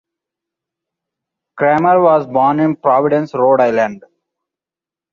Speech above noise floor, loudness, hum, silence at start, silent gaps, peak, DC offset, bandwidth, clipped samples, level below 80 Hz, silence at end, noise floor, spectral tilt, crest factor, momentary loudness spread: 76 dB; -13 LUFS; none; 1.55 s; none; -2 dBFS; under 0.1%; 7 kHz; under 0.1%; -62 dBFS; 1.15 s; -89 dBFS; -8.5 dB/octave; 14 dB; 6 LU